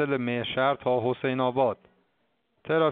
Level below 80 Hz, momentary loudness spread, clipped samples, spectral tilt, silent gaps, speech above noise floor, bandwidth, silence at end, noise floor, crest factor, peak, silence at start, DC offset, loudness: -68 dBFS; 4 LU; under 0.1%; -4 dB/octave; none; 48 dB; 4.6 kHz; 0 s; -73 dBFS; 16 dB; -10 dBFS; 0 s; under 0.1%; -27 LUFS